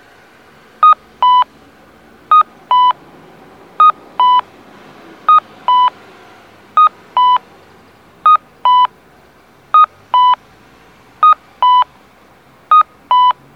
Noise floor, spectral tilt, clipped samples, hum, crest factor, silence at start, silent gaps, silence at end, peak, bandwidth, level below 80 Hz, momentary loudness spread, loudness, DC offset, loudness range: -46 dBFS; -2.5 dB/octave; under 0.1%; none; 14 dB; 0.8 s; none; 0.25 s; 0 dBFS; 6.2 kHz; -60 dBFS; 5 LU; -11 LUFS; under 0.1%; 1 LU